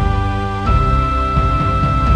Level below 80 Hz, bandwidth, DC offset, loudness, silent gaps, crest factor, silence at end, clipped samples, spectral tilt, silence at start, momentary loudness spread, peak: -18 dBFS; 9 kHz; under 0.1%; -16 LUFS; none; 14 dB; 0 s; under 0.1%; -7.5 dB/octave; 0 s; 4 LU; -2 dBFS